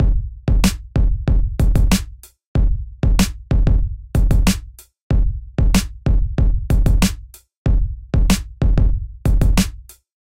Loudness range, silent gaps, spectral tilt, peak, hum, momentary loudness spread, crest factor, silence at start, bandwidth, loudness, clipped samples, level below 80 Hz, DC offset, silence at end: 1 LU; 2.46-2.55 s, 5.01-5.10 s, 7.57-7.65 s; -5.5 dB/octave; -2 dBFS; none; 6 LU; 14 dB; 0 s; 16 kHz; -19 LUFS; under 0.1%; -18 dBFS; 0.2%; 0.55 s